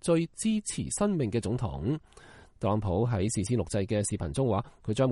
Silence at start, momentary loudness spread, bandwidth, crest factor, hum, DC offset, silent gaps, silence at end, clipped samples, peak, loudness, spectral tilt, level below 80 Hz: 0.05 s; 5 LU; 11.5 kHz; 16 dB; none; under 0.1%; none; 0 s; under 0.1%; -12 dBFS; -30 LUFS; -6 dB/octave; -50 dBFS